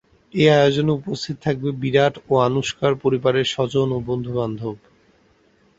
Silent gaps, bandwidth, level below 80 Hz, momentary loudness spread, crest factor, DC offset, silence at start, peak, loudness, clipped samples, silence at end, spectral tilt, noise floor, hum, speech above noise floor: none; 8 kHz; -52 dBFS; 11 LU; 18 dB; under 0.1%; 0.35 s; -2 dBFS; -20 LUFS; under 0.1%; 1 s; -6 dB/octave; -58 dBFS; none; 39 dB